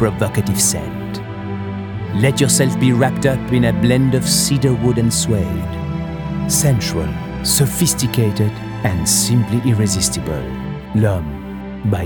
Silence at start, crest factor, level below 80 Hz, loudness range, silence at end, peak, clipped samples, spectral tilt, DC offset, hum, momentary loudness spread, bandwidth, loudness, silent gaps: 0 s; 16 dB; -36 dBFS; 3 LU; 0 s; 0 dBFS; under 0.1%; -4.5 dB/octave; under 0.1%; none; 12 LU; over 20 kHz; -17 LUFS; none